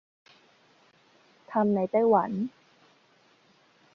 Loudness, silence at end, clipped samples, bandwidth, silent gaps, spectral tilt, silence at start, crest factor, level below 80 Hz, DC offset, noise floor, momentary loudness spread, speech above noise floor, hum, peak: -26 LUFS; 1.45 s; under 0.1%; 6.4 kHz; none; -9.5 dB/octave; 1.5 s; 20 dB; -74 dBFS; under 0.1%; -63 dBFS; 11 LU; 38 dB; none; -10 dBFS